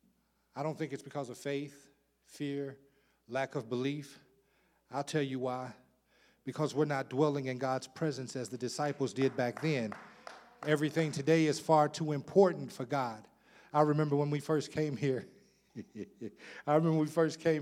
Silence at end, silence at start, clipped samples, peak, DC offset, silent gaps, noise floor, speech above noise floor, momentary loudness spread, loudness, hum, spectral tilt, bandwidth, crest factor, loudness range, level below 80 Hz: 0 s; 0.55 s; under 0.1%; -12 dBFS; under 0.1%; none; -73 dBFS; 40 dB; 18 LU; -33 LUFS; none; -6 dB/octave; 15 kHz; 22 dB; 9 LU; -80 dBFS